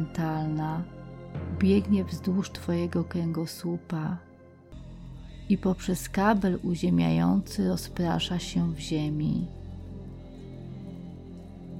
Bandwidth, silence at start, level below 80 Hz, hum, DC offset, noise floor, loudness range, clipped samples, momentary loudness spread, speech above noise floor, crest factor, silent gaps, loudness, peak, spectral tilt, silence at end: 16 kHz; 0 s; -48 dBFS; none; under 0.1%; -50 dBFS; 5 LU; under 0.1%; 20 LU; 23 dB; 16 dB; none; -28 LUFS; -12 dBFS; -6.5 dB/octave; 0 s